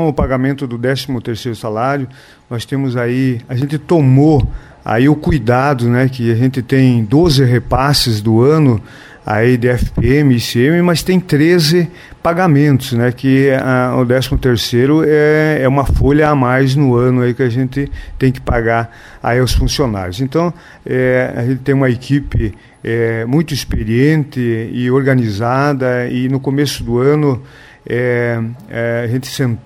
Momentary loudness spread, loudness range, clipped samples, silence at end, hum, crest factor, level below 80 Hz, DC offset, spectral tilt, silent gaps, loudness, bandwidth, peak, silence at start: 9 LU; 4 LU; under 0.1%; 0.05 s; none; 12 dB; -28 dBFS; under 0.1%; -6.5 dB/octave; none; -14 LUFS; 16 kHz; 0 dBFS; 0 s